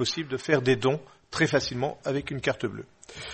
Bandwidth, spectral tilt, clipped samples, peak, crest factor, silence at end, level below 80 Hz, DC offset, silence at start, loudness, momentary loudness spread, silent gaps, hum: 8.8 kHz; -5 dB/octave; under 0.1%; -8 dBFS; 20 dB; 0 s; -56 dBFS; under 0.1%; 0 s; -27 LUFS; 13 LU; none; none